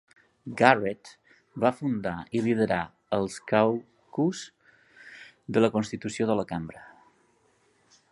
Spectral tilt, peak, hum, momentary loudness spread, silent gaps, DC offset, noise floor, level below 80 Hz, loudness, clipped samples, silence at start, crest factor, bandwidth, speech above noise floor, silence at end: -6 dB/octave; -2 dBFS; none; 22 LU; none; under 0.1%; -66 dBFS; -62 dBFS; -27 LUFS; under 0.1%; 0.45 s; 26 dB; 11.5 kHz; 40 dB; 1.25 s